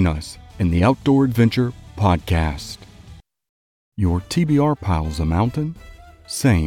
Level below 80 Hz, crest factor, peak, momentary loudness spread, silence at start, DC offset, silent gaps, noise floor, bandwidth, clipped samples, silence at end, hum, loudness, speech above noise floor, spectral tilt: -36 dBFS; 16 dB; -4 dBFS; 14 LU; 0 s; under 0.1%; 3.49-3.92 s; -44 dBFS; 16.5 kHz; under 0.1%; 0 s; none; -20 LUFS; 26 dB; -6.5 dB/octave